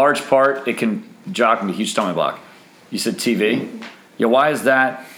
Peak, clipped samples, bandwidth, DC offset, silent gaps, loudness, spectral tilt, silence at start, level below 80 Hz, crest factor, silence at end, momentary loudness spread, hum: -2 dBFS; under 0.1%; over 20 kHz; under 0.1%; none; -18 LUFS; -4 dB/octave; 0 s; -70 dBFS; 18 dB; 0 s; 14 LU; none